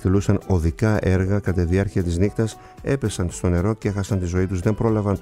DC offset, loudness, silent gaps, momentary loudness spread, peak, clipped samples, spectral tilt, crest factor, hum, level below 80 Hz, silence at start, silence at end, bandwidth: under 0.1%; -22 LUFS; none; 5 LU; -2 dBFS; under 0.1%; -7.5 dB/octave; 18 dB; none; -36 dBFS; 0 s; 0 s; 12.5 kHz